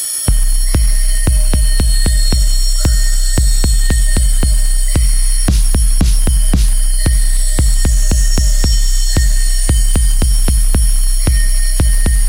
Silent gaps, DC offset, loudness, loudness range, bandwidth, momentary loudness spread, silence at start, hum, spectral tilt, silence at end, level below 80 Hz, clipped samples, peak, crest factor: none; under 0.1%; -14 LUFS; 0 LU; 16 kHz; 2 LU; 0 s; none; -3.5 dB/octave; 0 s; -10 dBFS; under 0.1%; 0 dBFS; 10 dB